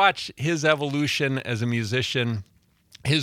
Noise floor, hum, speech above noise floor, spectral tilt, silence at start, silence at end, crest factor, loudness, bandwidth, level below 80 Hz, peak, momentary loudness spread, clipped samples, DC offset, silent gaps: -55 dBFS; none; 31 dB; -5 dB/octave; 0 s; 0 s; 20 dB; -25 LUFS; 15 kHz; -62 dBFS; -4 dBFS; 7 LU; under 0.1%; under 0.1%; none